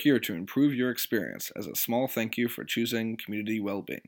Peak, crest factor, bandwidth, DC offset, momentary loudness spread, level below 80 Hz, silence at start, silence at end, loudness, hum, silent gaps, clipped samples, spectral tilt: -12 dBFS; 18 dB; 19 kHz; under 0.1%; 7 LU; -76 dBFS; 0 s; 0.1 s; -29 LUFS; none; none; under 0.1%; -4.5 dB/octave